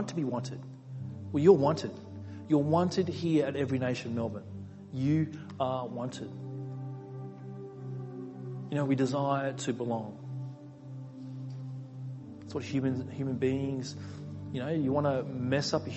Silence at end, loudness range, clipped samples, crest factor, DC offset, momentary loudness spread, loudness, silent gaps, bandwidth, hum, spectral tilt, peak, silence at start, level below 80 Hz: 0 s; 10 LU; under 0.1%; 24 dB; under 0.1%; 16 LU; -32 LUFS; none; 8.6 kHz; none; -7 dB/octave; -8 dBFS; 0 s; -60 dBFS